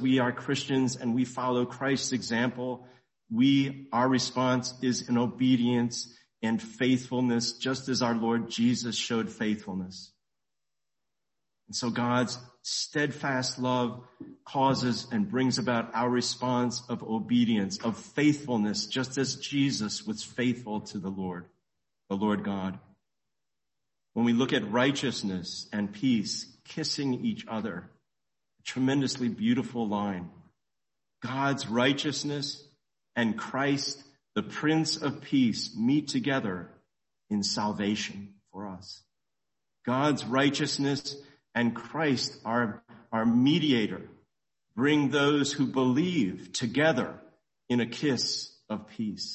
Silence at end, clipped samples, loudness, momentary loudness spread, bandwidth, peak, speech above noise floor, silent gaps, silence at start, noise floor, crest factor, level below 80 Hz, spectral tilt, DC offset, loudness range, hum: 0 s; under 0.1%; -29 LUFS; 12 LU; 8.6 kHz; -12 dBFS; 61 dB; none; 0 s; -89 dBFS; 18 dB; -66 dBFS; -4.5 dB/octave; under 0.1%; 5 LU; none